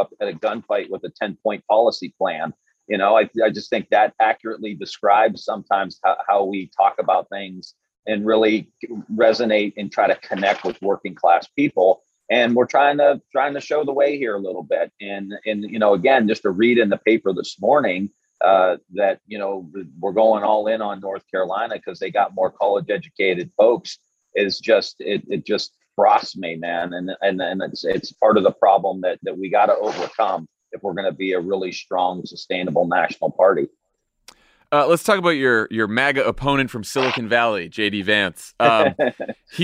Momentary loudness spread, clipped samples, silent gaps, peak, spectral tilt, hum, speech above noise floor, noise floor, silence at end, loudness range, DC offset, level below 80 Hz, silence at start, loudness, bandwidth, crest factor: 11 LU; under 0.1%; 7.99-8.03 s; -2 dBFS; -5 dB/octave; none; 33 dB; -52 dBFS; 0 s; 3 LU; under 0.1%; -58 dBFS; 0 s; -20 LUFS; 15 kHz; 18 dB